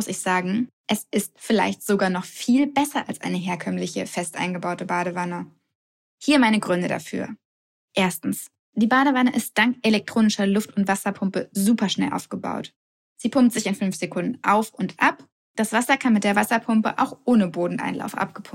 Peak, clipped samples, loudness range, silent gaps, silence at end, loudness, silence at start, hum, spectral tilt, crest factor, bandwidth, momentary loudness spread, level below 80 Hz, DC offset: -4 dBFS; under 0.1%; 3 LU; 0.73-0.84 s, 5.75-6.18 s, 7.45-7.88 s, 8.59-8.73 s, 12.76-13.16 s, 15.32-15.55 s; 0.05 s; -23 LUFS; 0 s; none; -4.5 dB/octave; 18 dB; 16.5 kHz; 10 LU; -68 dBFS; under 0.1%